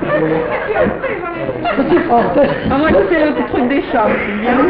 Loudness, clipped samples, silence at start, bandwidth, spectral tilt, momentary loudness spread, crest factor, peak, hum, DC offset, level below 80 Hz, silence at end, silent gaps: -14 LUFS; under 0.1%; 0 s; 5.2 kHz; -11.5 dB/octave; 7 LU; 12 dB; -2 dBFS; none; under 0.1%; -36 dBFS; 0 s; none